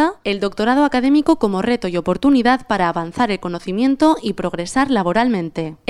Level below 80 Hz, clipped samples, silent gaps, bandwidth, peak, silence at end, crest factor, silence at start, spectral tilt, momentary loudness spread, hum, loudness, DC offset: -44 dBFS; under 0.1%; none; 12 kHz; -2 dBFS; 0.15 s; 14 dB; 0 s; -6 dB/octave; 7 LU; none; -17 LUFS; under 0.1%